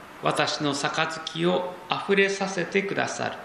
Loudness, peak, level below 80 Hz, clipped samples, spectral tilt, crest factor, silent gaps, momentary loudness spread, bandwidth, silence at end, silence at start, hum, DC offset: -25 LUFS; -6 dBFS; -68 dBFS; under 0.1%; -4 dB/octave; 22 dB; none; 6 LU; 13 kHz; 0 s; 0 s; none; under 0.1%